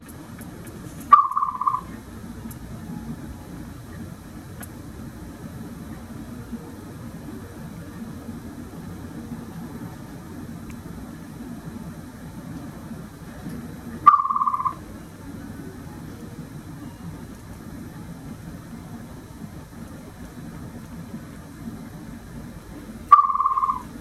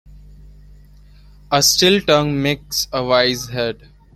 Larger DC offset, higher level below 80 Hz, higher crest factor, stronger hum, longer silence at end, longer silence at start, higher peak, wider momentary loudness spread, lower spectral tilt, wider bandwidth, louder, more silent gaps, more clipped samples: neither; about the same, -48 dBFS vs -44 dBFS; first, 28 dB vs 18 dB; second, none vs 50 Hz at -35 dBFS; second, 0 s vs 0.4 s; about the same, 0 s vs 0.1 s; about the same, 0 dBFS vs 0 dBFS; first, 20 LU vs 11 LU; first, -6 dB/octave vs -3 dB/octave; about the same, 15 kHz vs 16.5 kHz; second, -24 LUFS vs -16 LUFS; neither; neither